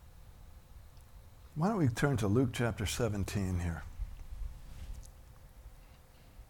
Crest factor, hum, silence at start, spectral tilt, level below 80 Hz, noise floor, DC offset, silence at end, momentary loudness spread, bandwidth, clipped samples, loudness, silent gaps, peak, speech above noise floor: 20 dB; none; 0 s; -6 dB/octave; -48 dBFS; -57 dBFS; under 0.1%; 0.05 s; 26 LU; 18.5 kHz; under 0.1%; -33 LUFS; none; -16 dBFS; 25 dB